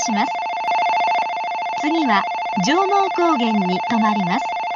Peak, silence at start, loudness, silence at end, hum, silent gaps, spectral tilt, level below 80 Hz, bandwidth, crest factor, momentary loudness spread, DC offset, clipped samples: -4 dBFS; 0 s; -19 LUFS; 0 s; none; none; -4.5 dB/octave; -64 dBFS; 7.4 kHz; 14 dB; 5 LU; under 0.1%; under 0.1%